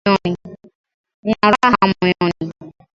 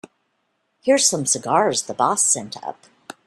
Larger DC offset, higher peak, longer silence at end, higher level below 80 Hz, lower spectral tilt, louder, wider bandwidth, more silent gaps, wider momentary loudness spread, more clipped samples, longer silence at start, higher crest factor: neither; first, 0 dBFS vs -4 dBFS; second, 0.3 s vs 0.55 s; first, -48 dBFS vs -68 dBFS; first, -6.5 dB/octave vs -2 dB/octave; about the same, -16 LUFS vs -18 LUFS; second, 7.8 kHz vs 14 kHz; first, 0.75-0.84 s, 0.94-1.04 s, 1.14-1.23 s vs none; about the same, 15 LU vs 15 LU; neither; second, 0.05 s vs 0.85 s; about the same, 18 dB vs 18 dB